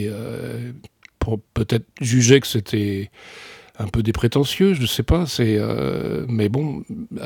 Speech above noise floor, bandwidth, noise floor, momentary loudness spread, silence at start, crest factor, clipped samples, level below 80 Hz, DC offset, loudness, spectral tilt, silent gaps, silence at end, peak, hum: 23 dB; 19 kHz; -43 dBFS; 16 LU; 0 s; 20 dB; under 0.1%; -36 dBFS; under 0.1%; -21 LUFS; -5.5 dB/octave; none; 0 s; -2 dBFS; none